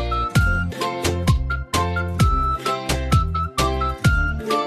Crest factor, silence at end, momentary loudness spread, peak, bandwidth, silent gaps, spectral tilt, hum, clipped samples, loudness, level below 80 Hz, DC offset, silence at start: 16 dB; 0 s; 4 LU; -4 dBFS; 14 kHz; none; -5.5 dB/octave; none; under 0.1%; -21 LUFS; -26 dBFS; under 0.1%; 0 s